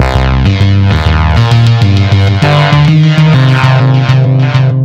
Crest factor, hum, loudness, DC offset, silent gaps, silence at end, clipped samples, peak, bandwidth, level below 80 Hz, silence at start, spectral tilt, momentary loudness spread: 6 dB; none; -7 LUFS; under 0.1%; none; 0 s; 0.9%; 0 dBFS; 8.4 kHz; -18 dBFS; 0 s; -7 dB/octave; 3 LU